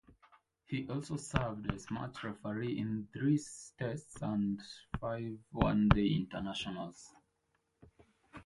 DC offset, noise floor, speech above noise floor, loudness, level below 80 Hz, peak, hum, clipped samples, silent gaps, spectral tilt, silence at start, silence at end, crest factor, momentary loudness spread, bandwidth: under 0.1%; -80 dBFS; 44 dB; -37 LUFS; -50 dBFS; -8 dBFS; none; under 0.1%; none; -6.5 dB/octave; 0.1 s; 0 s; 28 dB; 13 LU; 11.5 kHz